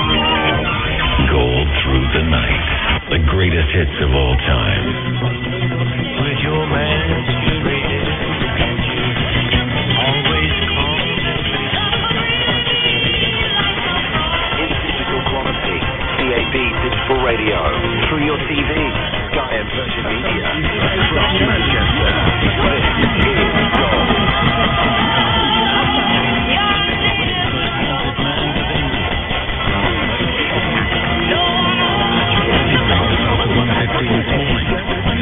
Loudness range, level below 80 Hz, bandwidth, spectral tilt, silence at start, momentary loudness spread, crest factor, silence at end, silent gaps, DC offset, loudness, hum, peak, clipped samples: 3 LU; -24 dBFS; 4 kHz; -9 dB/octave; 0 s; 5 LU; 16 dB; 0 s; none; under 0.1%; -15 LUFS; none; 0 dBFS; under 0.1%